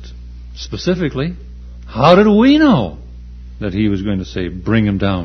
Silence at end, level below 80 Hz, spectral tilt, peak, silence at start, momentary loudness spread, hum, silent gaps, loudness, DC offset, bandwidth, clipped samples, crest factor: 0 s; -32 dBFS; -7.5 dB/octave; 0 dBFS; 0 s; 26 LU; 60 Hz at -30 dBFS; none; -14 LUFS; under 0.1%; 6.4 kHz; under 0.1%; 16 dB